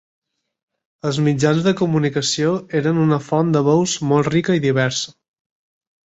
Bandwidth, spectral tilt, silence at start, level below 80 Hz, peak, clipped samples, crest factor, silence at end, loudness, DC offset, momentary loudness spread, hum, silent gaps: 8.2 kHz; -5.5 dB/octave; 1.05 s; -56 dBFS; -4 dBFS; under 0.1%; 16 dB; 0.95 s; -18 LUFS; under 0.1%; 4 LU; none; none